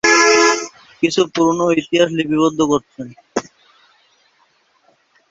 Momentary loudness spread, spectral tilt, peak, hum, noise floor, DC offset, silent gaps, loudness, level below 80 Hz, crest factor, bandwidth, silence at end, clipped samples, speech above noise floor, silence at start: 15 LU; -3 dB/octave; 0 dBFS; none; -59 dBFS; under 0.1%; none; -16 LUFS; -56 dBFS; 18 dB; 8 kHz; 1.9 s; under 0.1%; 42 dB; 0.05 s